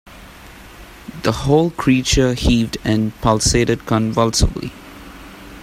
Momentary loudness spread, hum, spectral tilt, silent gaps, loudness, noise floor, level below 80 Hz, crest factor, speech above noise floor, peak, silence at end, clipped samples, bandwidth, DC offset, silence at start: 22 LU; none; -5 dB/octave; none; -17 LUFS; -39 dBFS; -28 dBFS; 18 dB; 23 dB; 0 dBFS; 0 s; under 0.1%; 16 kHz; under 0.1%; 0.05 s